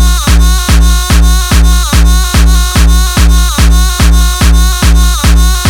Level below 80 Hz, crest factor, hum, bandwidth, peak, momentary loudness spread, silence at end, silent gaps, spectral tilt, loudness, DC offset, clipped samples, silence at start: -6 dBFS; 6 dB; none; 18 kHz; 0 dBFS; 0 LU; 0 s; none; -4 dB/octave; -8 LUFS; under 0.1%; under 0.1%; 0 s